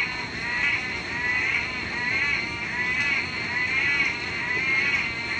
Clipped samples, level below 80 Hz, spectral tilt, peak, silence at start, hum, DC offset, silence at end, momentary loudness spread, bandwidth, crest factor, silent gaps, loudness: under 0.1%; -52 dBFS; -3 dB/octave; -12 dBFS; 0 s; none; under 0.1%; 0 s; 6 LU; 9.8 kHz; 14 dB; none; -24 LUFS